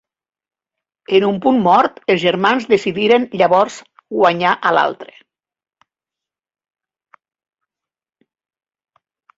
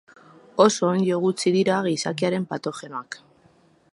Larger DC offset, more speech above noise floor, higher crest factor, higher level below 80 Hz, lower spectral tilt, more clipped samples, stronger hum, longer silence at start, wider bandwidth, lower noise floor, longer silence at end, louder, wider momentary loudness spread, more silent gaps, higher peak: neither; first, over 76 dB vs 36 dB; second, 16 dB vs 22 dB; first, -62 dBFS vs -70 dBFS; about the same, -5.5 dB/octave vs -5 dB/octave; neither; neither; first, 1.1 s vs 0.55 s; second, 7.8 kHz vs 11.5 kHz; first, under -90 dBFS vs -58 dBFS; first, 4.35 s vs 0.75 s; first, -15 LUFS vs -22 LUFS; second, 7 LU vs 16 LU; neither; about the same, -2 dBFS vs -2 dBFS